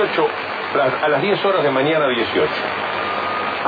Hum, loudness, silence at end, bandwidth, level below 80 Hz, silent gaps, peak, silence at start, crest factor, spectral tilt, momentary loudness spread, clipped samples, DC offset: none; -18 LUFS; 0 s; 5 kHz; -60 dBFS; none; -6 dBFS; 0 s; 12 dB; -7 dB/octave; 5 LU; under 0.1%; under 0.1%